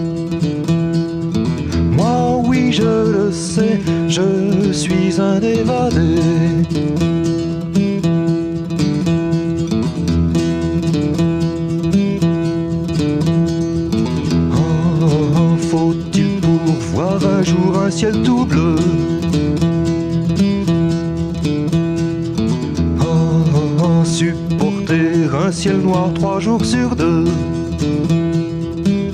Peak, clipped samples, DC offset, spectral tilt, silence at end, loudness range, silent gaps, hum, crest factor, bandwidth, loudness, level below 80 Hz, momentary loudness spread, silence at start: -2 dBFS; under 0.1%; under 0.1%; -7 dB/octave; 0 s; 2 LU; none; none; 14 dB; 10.5 kHz; -16 LUFS; -34 dBFS; 4 LU; 0 s